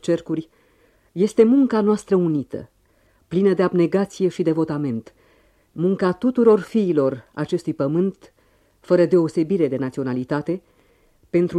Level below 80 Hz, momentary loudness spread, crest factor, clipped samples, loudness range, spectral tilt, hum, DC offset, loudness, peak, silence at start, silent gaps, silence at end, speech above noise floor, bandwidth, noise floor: -60 dBFS; 12 LU; 18 dB; under 0.1%; 3 LU; -8 dB/octave; none; under 0.1%; -20 LUFS; -4 dBFS; 0.05 s; none; 0 s; 40 dB; 10.5 kHz; -60 dBFS